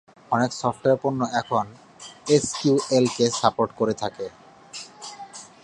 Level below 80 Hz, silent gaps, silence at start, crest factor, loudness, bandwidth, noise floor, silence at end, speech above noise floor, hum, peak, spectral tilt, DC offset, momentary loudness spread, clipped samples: -62 dBFS; none; 0.3 s; 22 dB; -23 LUFS; 11.5 kHz; -42 dBFS; 0.15 s; 20 dB; none; -2 dBFS; -4.5 dB/octave; under 0.1%; 18 LU; under 0.1%